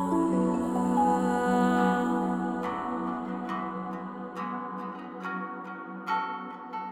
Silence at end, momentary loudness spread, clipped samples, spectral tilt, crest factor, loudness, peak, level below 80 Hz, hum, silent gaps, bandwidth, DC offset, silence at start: 0 s; 13 LU; under 0.1%; -7 dB/octave; 16 dB; -30 LUFS; -12 dBFS; -62 dBFS; none; none; 14 kHz; under 0.1%; 0 s